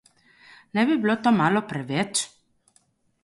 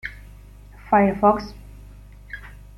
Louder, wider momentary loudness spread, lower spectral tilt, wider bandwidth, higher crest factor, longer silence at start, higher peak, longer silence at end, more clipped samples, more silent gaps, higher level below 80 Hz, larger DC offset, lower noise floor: second, -23 LUFS vs -19 LUFS; second, 8 LU vs 21 LU; second, -4.5 dB/octave vs -8 dB/octave; second, 11.5 kHz vs 13 kHz; about the same, 18 dB vs 20 dB; first, 0.75 s vs 0.05 s; second, -8 dBFS vs -4 dBFS; first, 0.95 s vs 0.25 s; neither; neither; second, -66 dBFS vs -42 dBFS; neither; first, -65 dBFS vs -44 dBFS